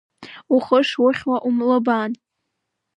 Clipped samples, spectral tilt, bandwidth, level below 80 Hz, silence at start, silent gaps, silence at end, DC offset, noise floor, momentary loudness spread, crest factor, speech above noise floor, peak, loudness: under 0.1%; -5.5 dB/octave; 8 kHz; -66 dBFS; 0.2 s; none; 0.85 s; under 0.1%; -77 dBFS; 7 LU; 18 dB; 59 dB; -2 dBFS; -19 LUFS